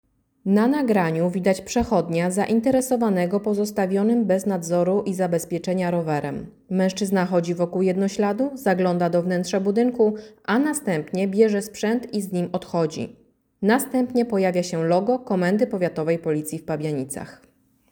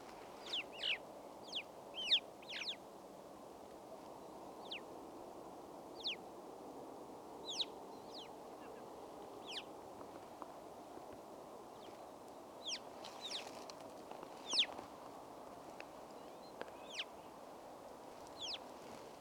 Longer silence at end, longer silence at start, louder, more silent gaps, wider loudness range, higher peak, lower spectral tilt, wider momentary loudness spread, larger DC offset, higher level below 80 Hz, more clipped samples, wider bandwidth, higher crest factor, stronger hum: first, 0.6 s vs 0 s; first, 0.45 s vs 0 s; first, -22 LUFS vs -46 LUFS; neither; second, 2 LU vs 10 LU; first, -6 dBFS vs -24 dBFS; first, -6 dB/octave vs -1.5 dB/octave; second, 7 LU vs 15 LU; neither; first, -56 dBFS vs -80 dBFS; neither; about the same, over 20 kHz vs 19 kHz; second, 16 dB vs 24 dB; neither